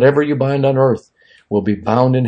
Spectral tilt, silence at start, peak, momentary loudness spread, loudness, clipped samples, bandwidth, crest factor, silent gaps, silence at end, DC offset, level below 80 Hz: -9 dB/octave; 0 s; 0 dBFS; 7 LU; -16 LUFS; under 0.1%; 7.4 kHz; 14 dB; none; 0 s; under 0.1%; -56 dBFS